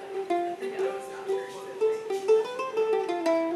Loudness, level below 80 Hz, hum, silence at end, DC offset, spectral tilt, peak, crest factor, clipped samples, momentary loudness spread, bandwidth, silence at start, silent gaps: -29 LUFS; -82 dBFS; none; 0 s; under 0.1%; -4 dB/octave; -12 dBFS; 16 dB; under 0.1%; 8 LU; 13 kHz; 0 s; none